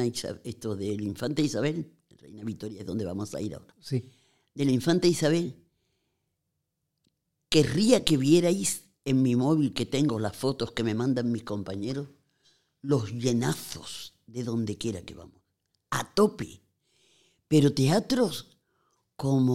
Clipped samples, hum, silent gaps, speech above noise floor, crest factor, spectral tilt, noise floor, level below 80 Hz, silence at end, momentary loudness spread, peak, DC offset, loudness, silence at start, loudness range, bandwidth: under 0.1%; none; none; 54 dB; 26 dB; -5.5 dB/octave; -81 dBFS; -58 dBFS; 0 s; 15 LU; -2 dBFS; under 0.1%; -27 LUFS; 0 s; 8 LU; 16 kHz